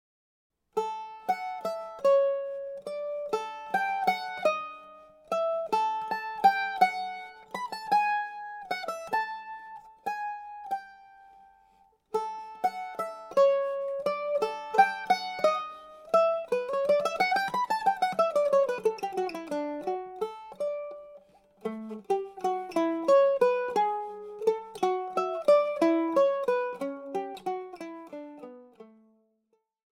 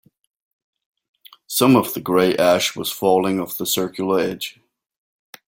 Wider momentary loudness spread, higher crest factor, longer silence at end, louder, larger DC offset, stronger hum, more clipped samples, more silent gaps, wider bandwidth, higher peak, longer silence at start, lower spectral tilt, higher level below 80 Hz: first, 14 LU vs 9 LU; about the same, 22 dB vs 18 dB; first, 1.15 s vs 0.95 s; second, -29 LUFS vs -19 LUFS; neither; neither; neither; neither; about the same, 16.5 kHz vs 17 kHz; second, -8 dBFS vs -2 dBFS; second, 0.75 s vs 1.5 s; about the same, -4 dB/octave vs -4 dB/octave; second, -74 dBFS vs -60 dBFS